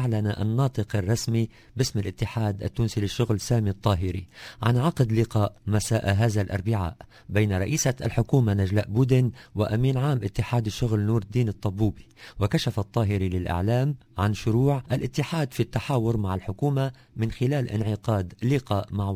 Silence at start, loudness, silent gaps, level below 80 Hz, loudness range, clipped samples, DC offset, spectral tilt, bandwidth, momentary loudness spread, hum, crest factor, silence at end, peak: 0 s; -26 LUFS; none; -42 dBFS; 3 LU; under 0.1%; under 0.1%; -6.5 dB/octave; 16 kHz; 6 LU; none; 18 dB; 0 s; -6 dBFS